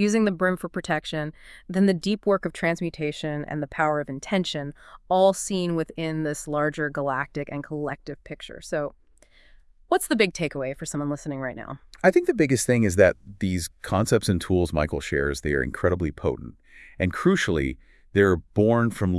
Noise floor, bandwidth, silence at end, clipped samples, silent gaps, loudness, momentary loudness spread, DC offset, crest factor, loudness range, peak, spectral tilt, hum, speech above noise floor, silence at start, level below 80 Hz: -55 dBFS; 12 kHz; 0 s; under 0.1%; none; -25 LUFS; 12 LU; under 0.1%; 22 dB; 6 LU; -4 dBFS; -5.5 dB/octave; none; 31 dB; 0 s; -46 dBFS